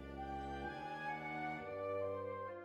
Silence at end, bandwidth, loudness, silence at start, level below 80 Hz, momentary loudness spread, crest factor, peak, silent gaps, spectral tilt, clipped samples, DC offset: 0 s; 13.5 kHz; -44 LUFS; 0 s; -60 dBFS; 4 LU; 12 dB; -32 dBFS; none; -7 dB/octave; under 0.1%; under 0.1%